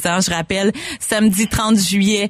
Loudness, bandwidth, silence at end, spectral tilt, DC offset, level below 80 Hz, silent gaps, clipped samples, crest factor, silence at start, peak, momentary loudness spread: -16 LUFS; 15.5 kHz; 0 s; -4 dB/octave; under 0.1%; -40 dBFS; none; under 0.1%; 12 dB; 0 s; -4 dBFS; 5 LU